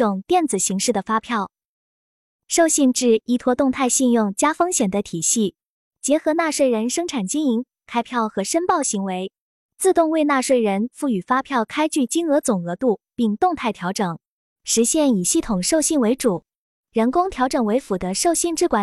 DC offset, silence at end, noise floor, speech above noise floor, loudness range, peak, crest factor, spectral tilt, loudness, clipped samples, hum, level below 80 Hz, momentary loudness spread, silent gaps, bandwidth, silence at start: under 0.1%; 0 s; under -90 dBFS; over 71 dB; 3 LU; -6 dBFS; 16 dB; -3.5 dB/octave; -20 LUFS; under 0.1%; none; -52 dBFS; 7 LU; 1.65-2.39 s, 5.65-5.91 s, 9.40-9.69 s, 14.27-14.56 s, 16.56-16.84 s; 14 kHz; 0 s